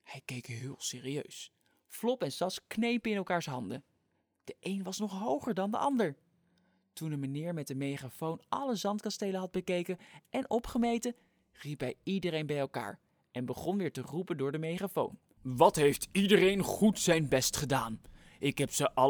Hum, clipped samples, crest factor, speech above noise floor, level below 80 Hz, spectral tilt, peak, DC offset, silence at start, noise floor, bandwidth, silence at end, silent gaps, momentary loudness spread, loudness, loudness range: none; under 0.1%; 24 dB; 45 dB; -62 dBFS; -4.5 dB/octave; -10 dBFS; under 0.1%; 0.1 s; -78 dBFS; over 20 kHz; 0 s; none; 16 LU; -33 LUFS; 8 LU